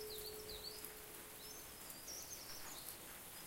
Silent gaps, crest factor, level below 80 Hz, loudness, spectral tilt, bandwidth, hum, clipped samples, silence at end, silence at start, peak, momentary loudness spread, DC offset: none; 24 dB; -68 dBFS; -50 LUFS; -1.5 dB/octave; 17 kHz; none; under 0.1%; 0 s; 0 s; -28 dBFS; 3 LU; under 0.1%